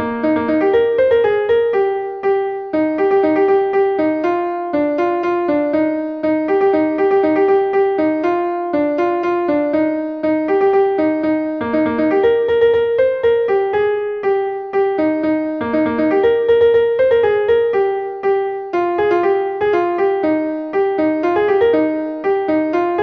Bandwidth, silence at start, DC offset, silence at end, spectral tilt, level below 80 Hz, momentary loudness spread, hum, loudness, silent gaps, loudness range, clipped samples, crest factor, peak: 5.6 kHz; 0 s; under 0.1%; 0 s; -7.5 dB/octave; -52 dBFS; 5 LU; none; -16 LUFS; none; 2 LU; under 0.1%; 12 dB; -4 dBFS